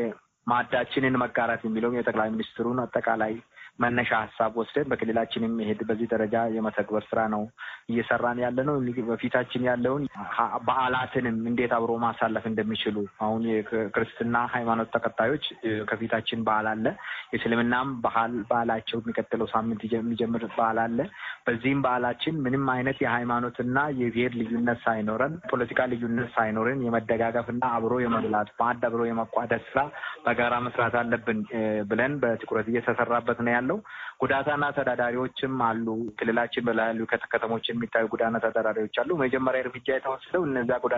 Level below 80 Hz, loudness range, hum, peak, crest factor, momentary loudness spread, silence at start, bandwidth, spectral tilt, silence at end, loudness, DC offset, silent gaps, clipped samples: -60 dBFS; 1 LU; none; -8 dBFS; 18 dB; 4 LU; 0 s; 6.8 kHz; -4 dB/octave; 0 s; -27 LUFS; under 0.1%; none; under 0.1%